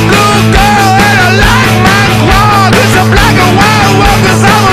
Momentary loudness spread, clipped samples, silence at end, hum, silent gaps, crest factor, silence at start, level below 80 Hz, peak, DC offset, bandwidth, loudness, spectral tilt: 1 LU; 4%; 0 s; none; none; 4 dB; 0 s; -18 dBFS; 0 dBFS; under 0.1%; 15.5 kHz; -5 LUFS; -4.5 dB/octave